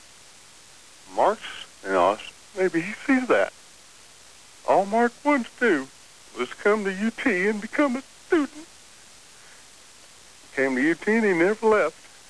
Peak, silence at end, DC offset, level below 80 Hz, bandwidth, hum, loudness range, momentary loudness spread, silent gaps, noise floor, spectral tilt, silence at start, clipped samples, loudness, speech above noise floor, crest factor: -8 dBFS; 0.4 s; 0.3%; -64 dBFS; 11 kHz; none; 3 LU; 12 LU; none; -50 dBFS; -5 dB/octave; 1.1 s; under 0.1%; -24 LUFS; 27 dB; 16 dB